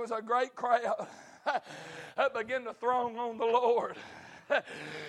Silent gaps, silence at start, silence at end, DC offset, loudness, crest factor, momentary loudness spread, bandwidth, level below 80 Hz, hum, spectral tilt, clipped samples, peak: none; 0 s; 0 s; under 0.1%; -32 LUFS; 18 dB; 16 LU; 11 kHz; -80 dBFS; none; -4 dB/octave; under 0.1%; -14 dBFS